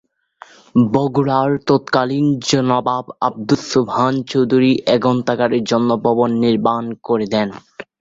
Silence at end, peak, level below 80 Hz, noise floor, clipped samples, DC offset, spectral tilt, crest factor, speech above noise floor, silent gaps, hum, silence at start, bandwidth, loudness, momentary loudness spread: 0.15 s; -2 dBFS; -54 dBFS; -44 dBFS; under 0.1%; under 0.1%; -6 dB/octave; 16 dB; 28 dB; none; none; 0.75 s; 7.8 kHz; -17 LUFS; 6 LU